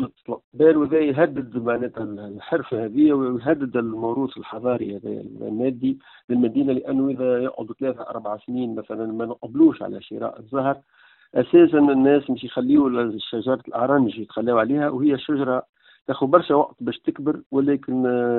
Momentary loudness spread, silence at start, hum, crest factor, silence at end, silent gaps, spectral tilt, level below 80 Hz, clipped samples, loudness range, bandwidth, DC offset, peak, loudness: 13 LU; 0 s; none; 20 dB; 0 s; 0.44-0.52 s, 6.24-6.28 s, 15.69-15.73 s, 17.46-17.50 s; -6 dB/octave; -62 dBFS; under 0.1%; 5 LU; 4.2 kHz; under 0.1%; -2 dBFS; -22 LUFS